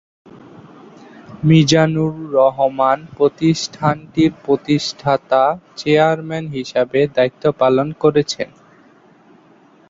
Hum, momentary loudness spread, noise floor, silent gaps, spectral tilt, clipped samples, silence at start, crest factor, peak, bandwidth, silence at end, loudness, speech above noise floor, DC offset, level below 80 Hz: none; 8 LU; -49 dBFS; none; -6 dB/octave; under 0.1%; 1.3 s; 16 dB; -2 dBFS; 7.8 kHz; 1.45 s; -16 LUFS; 33 dB; under 0.1%; -54 dBFS